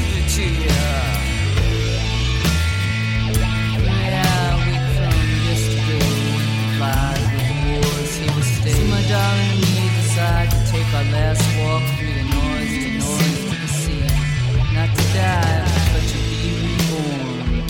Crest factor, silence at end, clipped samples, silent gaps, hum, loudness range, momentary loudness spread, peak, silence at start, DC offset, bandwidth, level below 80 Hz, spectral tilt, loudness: 12 dB; 0 s; under 0.1%; none; none; 2 LU; 4 LU; -6 dBFS; 0 s; under 0.1%; 17 kHz; -24 dBFS; -5 dB/octave; -19 LUFS